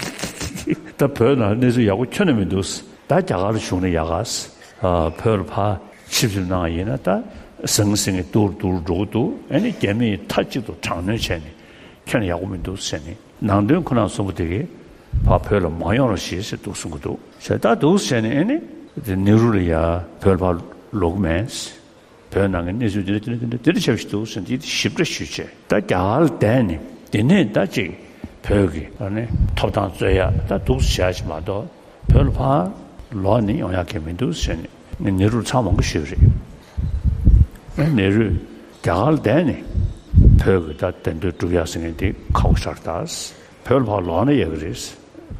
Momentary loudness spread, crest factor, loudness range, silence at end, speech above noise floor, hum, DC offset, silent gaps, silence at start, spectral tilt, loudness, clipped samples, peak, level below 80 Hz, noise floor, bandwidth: 12 LU; 18 dB; 3 LU; 0 s; 28 dB; none; under 0.1%; none; 0 s; -6 dB/octave; -20 LUFS; under 0.1%; 0 dBFS; -28 dBFS; -47 dBFS; 15.5 kHz